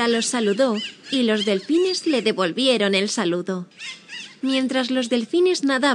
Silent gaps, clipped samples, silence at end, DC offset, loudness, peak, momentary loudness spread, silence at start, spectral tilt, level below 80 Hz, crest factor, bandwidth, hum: none; under 0.1%; 0 s; under 0.1%; -21 LUFS; -4 dBFS; 11 LU; 0 s; -3.5 dB/octave; -74 dBFS; 16 dB; 10.5 kHz; none